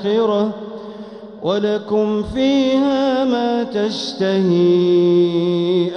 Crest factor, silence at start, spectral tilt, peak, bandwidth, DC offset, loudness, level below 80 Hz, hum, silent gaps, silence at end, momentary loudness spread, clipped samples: 12 dB; 0 s; -7 dB/octave; -6 dBFS; 6.8 kHz; under 0.1%; -17 LUFS; -48 dBFS; none; none; 0 s; 14 LU; under 0.1%